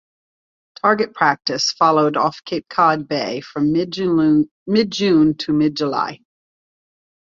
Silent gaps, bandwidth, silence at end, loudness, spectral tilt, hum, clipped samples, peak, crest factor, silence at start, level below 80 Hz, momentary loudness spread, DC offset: 4.51-4.66 s; 7.6 kHz; 1.2 s; -18 LUFS; -5 dB/octave; none; under 0.1%; -2 dBFS; 16 dB; 0.85 s; -58 dBFS; 8 LU; under 0.1%